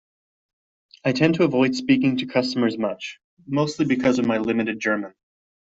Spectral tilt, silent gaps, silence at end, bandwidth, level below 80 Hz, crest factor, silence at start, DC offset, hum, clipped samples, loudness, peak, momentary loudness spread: -6 dB/octave; 3.24-3.37 s; 0.5 s; 8 kHz; -62 dBFS; 18 dB; 1.05 s; under 0.1%; none; under 0.1%; -22 LUFS; -4 dBFS; 8 LU